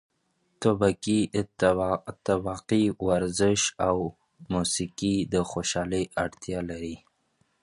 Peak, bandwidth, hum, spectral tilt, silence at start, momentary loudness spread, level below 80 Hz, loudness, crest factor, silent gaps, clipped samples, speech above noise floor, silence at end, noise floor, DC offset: -6 dBFS; 11.5 kHz; none; -4.5 dB/octave; 0.6 s; 9 LU; -50 dBFS; -27 LUFS; 20 dB; none; under 0.1%; 46 dB; 0.65 s; -72 dBFS; under 0.1%